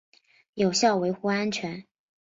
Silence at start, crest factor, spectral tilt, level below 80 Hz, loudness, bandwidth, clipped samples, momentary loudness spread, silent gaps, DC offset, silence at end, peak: 0.55 s; 18 dB; -4 dB/octave; -68 dBFS; -26 LUFS; 7.8 kHz; under 0.1%; 17 LU; none; under 0.1%; 0.5 s; -10 dBFS